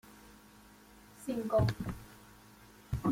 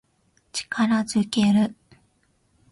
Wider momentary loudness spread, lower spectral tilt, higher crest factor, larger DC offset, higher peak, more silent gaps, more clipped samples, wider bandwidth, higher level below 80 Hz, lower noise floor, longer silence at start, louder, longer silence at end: first, 26 LU vs 11 LU; first, -7.5 dB/octave vs -5 dB/octave; about the same, 18 dB vs 16 dB; neither; second, -18 dBFS vs -8 dBFS; neither; neither; first, 16.5 kHz vs 11.5 kHz; first, -52 dBFS vs -62 dBFS; second, -58 dBFS vs -66 dBFS; second, 0.05 s vs 0.55 s; second, -35 LUFS vs -23 LUFS; second, 0 s vs 1 s